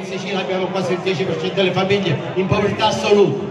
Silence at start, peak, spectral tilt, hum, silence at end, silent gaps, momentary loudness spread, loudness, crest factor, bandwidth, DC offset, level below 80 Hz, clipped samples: 0 s; -2 dBFS; -5.5 dB/octave; none; 0 s; none; 6 LU; -18 LUFS; 16 dB; 10.5 kHz; under 0.1%; -50 dBFS; under 0.1%